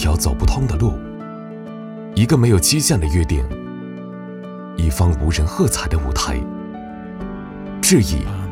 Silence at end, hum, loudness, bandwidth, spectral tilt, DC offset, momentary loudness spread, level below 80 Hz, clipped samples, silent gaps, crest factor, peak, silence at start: 0 s; none; -18 LUFS; 16.5 kHz; -5 dB/octave; under 0.1%; 18 LU; -26 dBFS; under 0.1%; none; 16 dB; -2 dBFS; 0 s